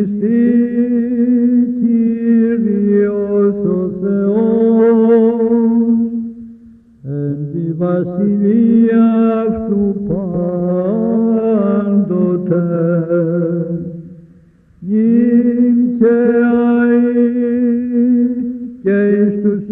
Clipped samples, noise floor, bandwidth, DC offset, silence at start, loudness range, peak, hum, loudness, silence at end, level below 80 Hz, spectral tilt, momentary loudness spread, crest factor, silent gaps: under 0.1%; -46 dBFS; 3.6 kHz; under 0.1%; 0 s; 3 LU; -2 dBFS; none; -14 LUFS; 0 s; -48 dBFS; -12.5 dB/octave; 9 LU; 12 dB; none